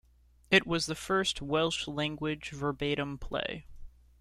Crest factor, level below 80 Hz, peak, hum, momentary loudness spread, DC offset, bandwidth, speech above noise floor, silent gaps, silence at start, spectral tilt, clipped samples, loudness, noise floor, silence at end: 22 dB; -52 dBFS; -10 dBFS; none; 9 LU; under 0.1%; 14.5 kHz; 27 dB; none; 0.5 s; -4 dB/octave; under 0.1%; -31 LUFS; -59 dBFS; 0.3 s